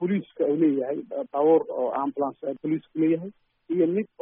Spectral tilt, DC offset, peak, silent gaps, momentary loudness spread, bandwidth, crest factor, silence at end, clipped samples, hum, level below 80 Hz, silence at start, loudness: -8 dB/octave; under 0.1%; -10 dBFS; none; 10 LU; 3.7 kHz; 16 dB; 0.15 s; under 0.1%; none; -74 dBFS; 0 s; -25 LUFS